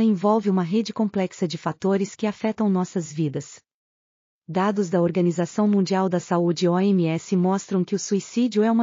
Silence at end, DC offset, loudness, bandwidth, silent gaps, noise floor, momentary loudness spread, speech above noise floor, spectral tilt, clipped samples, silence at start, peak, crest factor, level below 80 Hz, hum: 0 s; under 0.1%; -23 LUFS; 7.4 kHz; 3.74-4.42 s; under -90 dBFS; 7 LU; over 68 dB; -7 dB/octave; under 0.1%; 0 s; -8 dBFS; 14 dB; -72 dBFS; none